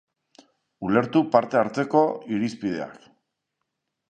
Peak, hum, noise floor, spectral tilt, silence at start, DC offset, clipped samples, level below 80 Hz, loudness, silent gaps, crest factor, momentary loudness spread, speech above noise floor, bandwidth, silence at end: -4 dBFS; none; -80 dBFS; -7 dB/octave; 0.8 s; under 0.1%; under 0.1%; -64 dBFS; -23 LUFS; none; 22 dB; 11 LU; 58 dB; 9.2 kHz; 1.15 s